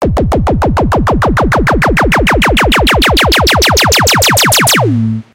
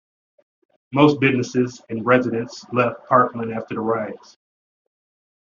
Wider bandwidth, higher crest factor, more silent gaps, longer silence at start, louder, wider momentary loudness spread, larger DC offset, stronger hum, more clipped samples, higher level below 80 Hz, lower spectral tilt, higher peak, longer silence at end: first, 17.5 kHz vs 7.4 kHz; second, 8 dB vs 20 dB; neither; second, 0 s vs 0.9 s; first, -8 LUFS vs -20 LUFS; second, 5 LU vs 11 LU; neither; neither; neither; first, -18 dBFS vs -64 dBFS; second, -3.5 dB/octave vs -5 dB/octave; about the same, 0 dBFS vs -2 dBFS; second, 0.1 s vs 1.25 s